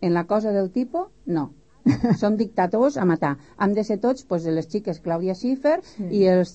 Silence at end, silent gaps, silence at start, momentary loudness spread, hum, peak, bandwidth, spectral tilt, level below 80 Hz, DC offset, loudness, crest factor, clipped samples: 0 s; none; 0 s; 7 LU; none; -8 dBFS; 8.4 kHz; -8 dB/octave; -56 dBFS; 0.2%; -23 LUFS; 14 dB; under 0.1%